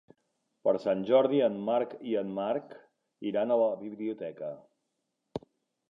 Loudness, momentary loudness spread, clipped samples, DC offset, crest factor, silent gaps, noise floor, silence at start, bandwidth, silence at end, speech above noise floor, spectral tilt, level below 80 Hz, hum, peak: -30 LUFS; 17 LU; under 0.1%; under 0.1%; 18 dB; none; -82 dBFS; 0.65 s; 5.8 kHz; 0.5 s; 53 dB; -8 dB/octave; -74 dBFS; none; -12 dBFS